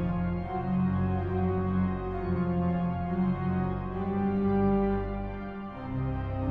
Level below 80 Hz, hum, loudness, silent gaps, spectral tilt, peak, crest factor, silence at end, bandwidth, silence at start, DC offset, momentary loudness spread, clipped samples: -42 dBFS; none; -30 LUFS; none; -11.5 dB/octave; -16 dBFS; 14 dB; 0 s; 4.5 kHz; 0 s; under 0.1%; 8 LU; under 0.1%